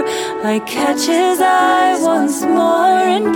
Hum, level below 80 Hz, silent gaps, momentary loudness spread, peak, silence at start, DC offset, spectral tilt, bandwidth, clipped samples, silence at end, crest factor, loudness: none; -58 dBFS; none; 6 LU; -4 dBFS; 0 s; under 0.1%; -3 dB/octave; 18.5 kHz; under 0.1%; 0 s; 10 dB; -14 LUFS